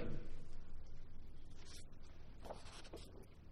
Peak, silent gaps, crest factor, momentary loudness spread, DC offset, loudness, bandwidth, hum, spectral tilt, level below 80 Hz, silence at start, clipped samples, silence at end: -32 dBFS; none; 14 dB; 7 LU; under 0.1%; -57 LUFS; 11 kHz; none; -5.5 dB/octave; -50 dBFS; 0 s; under 0.1%; 0 s